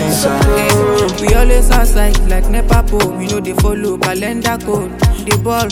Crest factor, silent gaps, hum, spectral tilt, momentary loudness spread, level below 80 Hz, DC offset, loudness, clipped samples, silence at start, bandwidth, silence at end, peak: 12 dB; none; none; -5 dB/octave; 5 LU; -14 dBFS; under 0.1%; -14 LUFS; under 0.1%; 0 s; 17 kHz; 0 s; 0 dBFS